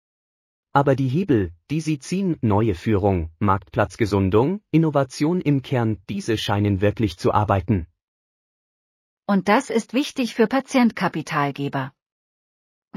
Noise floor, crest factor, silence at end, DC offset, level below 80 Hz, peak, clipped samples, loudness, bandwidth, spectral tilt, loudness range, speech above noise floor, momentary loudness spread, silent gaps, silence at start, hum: under -90 dBFS; 18 dB; 1.1 s; under 0.1%; -46 dBFS; -4 dBFS; under 0.1%; -21 LUFS; 15 kHz; -7 dB/octave; 3 LU; over 69 dB; 6 LU; 8.04-9.17 s; 0.75 s; none